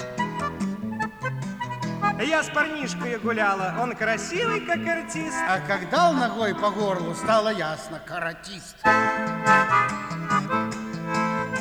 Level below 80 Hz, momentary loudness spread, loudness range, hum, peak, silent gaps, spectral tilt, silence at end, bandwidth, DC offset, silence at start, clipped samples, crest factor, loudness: -56 dBFS; 10 LU; 3 LU; none; -8 dBFS; none; -4.5 dB/octave; 0 s; over 20 kHz; under 0.1%; 0 s; under 0.1%; 18 dB; -24 LUFS